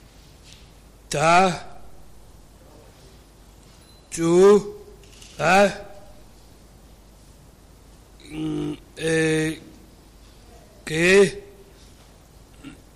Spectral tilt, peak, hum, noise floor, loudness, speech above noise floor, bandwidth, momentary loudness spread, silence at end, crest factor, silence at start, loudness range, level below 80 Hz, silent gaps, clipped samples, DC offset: -5 dB/octave; -8 dBFS; none; -49 dBFS; -20 LUFS; 30 dB; 14.5 kHz; 24 LU; 0.25 s; 18 dB; 1.1 s; 7 LU; -50 dBFS; none; under 0.1%; under 0.1%